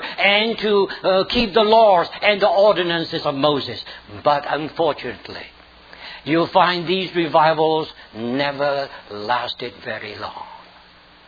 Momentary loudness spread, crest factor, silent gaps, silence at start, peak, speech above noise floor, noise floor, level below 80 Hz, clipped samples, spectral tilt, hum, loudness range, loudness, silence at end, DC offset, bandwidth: 17 LU; 18 dB; none; 0 s; -2 dBFS; 29 dB; -48 dBFS; -50 dBFS; under 0.1%; -6.5 dB/octave; none; 7 LU; -18 LUFS; 0.7 s; under 0.1%; 5 kHz